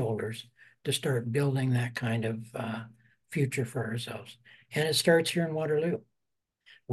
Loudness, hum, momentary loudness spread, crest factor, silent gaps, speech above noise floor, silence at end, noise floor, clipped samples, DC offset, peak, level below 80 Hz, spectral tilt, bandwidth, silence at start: -30 LUFS; none; 14 LU; 18 dB; none; 54 dB; 0 s; -84 dBFS; under 0.1%; under 0.1%; -12 dBFS; -72 dBFS; -5 dB/octave; 12.5 kHz; 0 s